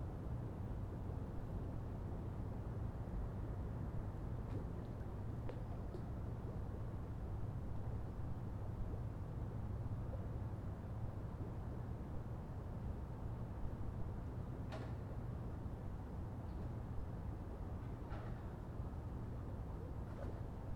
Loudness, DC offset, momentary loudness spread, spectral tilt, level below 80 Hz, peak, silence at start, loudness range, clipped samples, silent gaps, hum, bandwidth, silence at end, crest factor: -47 LUFS; under 0.1%; 2 LU; -9 dB/octave; -50 dBFS; -30 dBFS; 0 s; 2 LU; under 0.1%; none; none; 15 kHz; 0 s; 14 dB